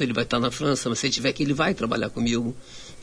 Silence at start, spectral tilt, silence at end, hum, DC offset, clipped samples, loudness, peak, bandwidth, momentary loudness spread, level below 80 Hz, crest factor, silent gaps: 0 s; -4.5 dB/octave; 0 s; none; under 0.1%; under 0.1%; -24 LUFS; -8 dBFS; 11 kHz; 6 LU; -48 dBFS; 16 dB; none